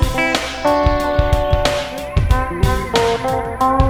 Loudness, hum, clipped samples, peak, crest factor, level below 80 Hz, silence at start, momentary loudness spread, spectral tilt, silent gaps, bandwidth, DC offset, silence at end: -17 LUFS; none; under 0.1%; 0 dBFS; 16 dB; -22 dBFS; 0 s; 4 LU; -5.5 dB/octave; none; 19.5 kHz; under 0.1%; 0 s